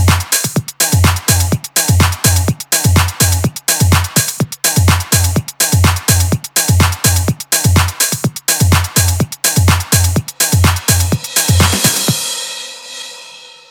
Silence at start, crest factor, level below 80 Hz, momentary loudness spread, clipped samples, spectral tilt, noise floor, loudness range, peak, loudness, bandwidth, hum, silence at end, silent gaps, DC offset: 0 s; 12 dB; -28 dBFS; 5 LU; under 0.1%; -3.5 dB/octave; -35 dBFS; 1 LU; 0 dBFS; -12 LUFS; over 20 kHz; none; 0.25 s; none; under 0.1%